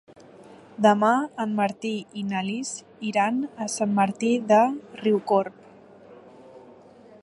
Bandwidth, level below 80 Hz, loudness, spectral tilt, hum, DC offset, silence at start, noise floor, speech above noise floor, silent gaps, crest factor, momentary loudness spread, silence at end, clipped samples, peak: 11.5 kHz; -74 dBFS; -24 LUFS; -5 dB/octave; none; under 0.1%; 0.4 s; -50 dBFS; 26 dB; none; 20 dB; 11 LU; 0.65 s; under 0.1%; -4 dBFS